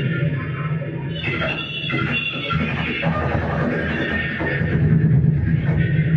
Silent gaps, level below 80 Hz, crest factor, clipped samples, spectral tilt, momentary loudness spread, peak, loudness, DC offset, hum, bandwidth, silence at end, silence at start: none; -34 dBFS; 14 dB; under 0.1%; -8.5 dB/octave; 8 LU; -6 dBFS; -21 LUFS; under 0.1%; none; 5.8 kHz; 0 s; 0 s